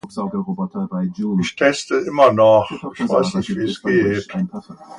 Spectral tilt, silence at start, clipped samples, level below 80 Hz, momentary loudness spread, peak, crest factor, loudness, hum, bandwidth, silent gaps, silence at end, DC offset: -6 dB/octave; 0.05 s; under 0.1%; -54 dBFS; 12 LU; 0 dBFS; 18 dB; -18 LUFS; none; 11 kHz; none; 0 s; under 0.1%